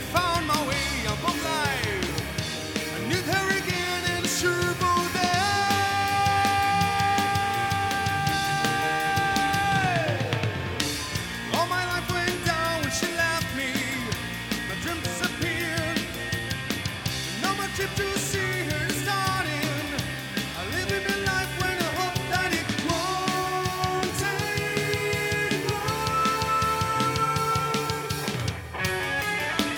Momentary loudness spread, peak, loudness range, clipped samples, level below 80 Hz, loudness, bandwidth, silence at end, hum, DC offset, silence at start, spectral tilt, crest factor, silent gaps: 6 LU; -8 dBFS; 4 LU; under 0.1%; -46 dBFS; -26 LUFS; 19 kHz; 0 s; none; under 0.1%; 0 s; -3.5 dB/octave; 20 dB; none